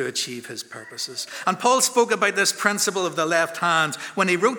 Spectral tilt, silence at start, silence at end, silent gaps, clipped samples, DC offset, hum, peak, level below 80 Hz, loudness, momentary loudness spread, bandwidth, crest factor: -2 dB/octave; 0 s; 0 s; none; under 0.1%; under 0.1%; none; -2 dBFS; -80 dBFS; -21 LUFS; 12 LU; over 20 kHz; 20 dB